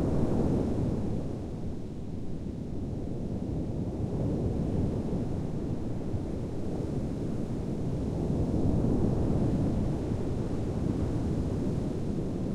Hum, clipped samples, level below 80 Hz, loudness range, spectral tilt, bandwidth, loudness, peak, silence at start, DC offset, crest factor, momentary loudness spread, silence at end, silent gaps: none; under 0.1%; -40 dBFS; 5 LU; -9 dB/octave; 11.5 kHz; -32 LUFS; -14 dBFS; 0 s; under 0.1%; 16 dB; 8 LU; 0 s; none